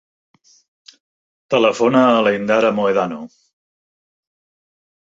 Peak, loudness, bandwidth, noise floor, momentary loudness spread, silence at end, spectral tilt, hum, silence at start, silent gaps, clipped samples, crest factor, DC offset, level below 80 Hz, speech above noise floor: -2 dBFS; -16 LUFS; 7.8 kHz; under -90 dBFS; 8 LU; 1.85 s; -5.5 dB/octave; none; 1.5 s; none; under 0.1%; 18 dB; under 0.1%; -64 dBFS; over 75 dB